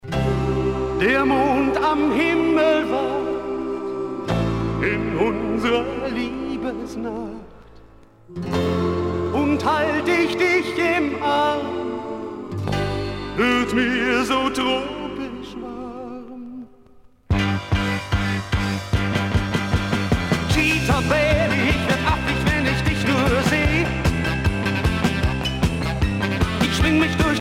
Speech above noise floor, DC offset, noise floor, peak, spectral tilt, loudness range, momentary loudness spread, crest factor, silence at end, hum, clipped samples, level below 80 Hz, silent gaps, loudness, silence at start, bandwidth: 29 dB; under 0.1%; -49 dBFS; -4 dBFS; -6 dB/octave; 7 LU; 11 LU; 16 dB; 0 s; none; under 0.1%; -32 dBFS; none; -21 LUFS; 0.05 s; 16.5 kHz